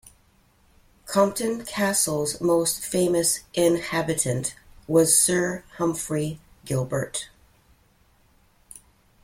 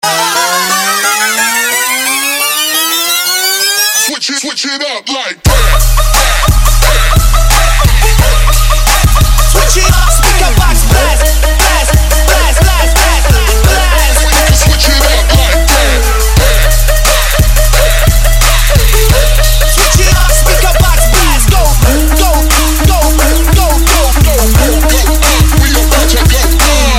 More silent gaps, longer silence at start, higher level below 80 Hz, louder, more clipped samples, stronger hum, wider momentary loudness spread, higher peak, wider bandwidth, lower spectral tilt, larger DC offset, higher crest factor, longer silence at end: neither; first, 1.05 s vs 0.05 s; second, -56 dBFS vs -8 dBFS; second, -23 LUFS vs -8 LUFS; second, under 0.1% vs 0.3%; neither; first, 11 LU vs 2 LU; second, -6 dBFS vs 0 dBFS; about the same, 16.5 kHz vs 17 kHz; about the same, -4 dB/octave vs -3 dB/octave; neither; first, 20 dB vs 6 dB; first, 0.45 s vs 0 s